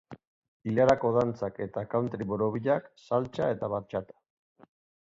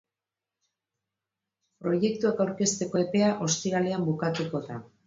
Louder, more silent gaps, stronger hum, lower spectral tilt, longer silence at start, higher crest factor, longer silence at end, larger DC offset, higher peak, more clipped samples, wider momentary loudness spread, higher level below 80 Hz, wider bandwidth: about the same, -29 LUFS vs -27 LUFS; first, 0.27-0.42 s, 0.48-0.60 s vs none; neither; first, -8 dB/octave vs -5 dB/octave; second, 0.1 s vs 1.8 s; about the same, 20 dB vs 18 dB; first, 1 s vs 0.2 s; neither; about the same, -10 dBFS vs -12 dBFS; neither; first, 11 LU vs 8 LU; first, -60 dBFS vs -70 dBFS; about the same, 7.8 kHz vs 7.8 kHz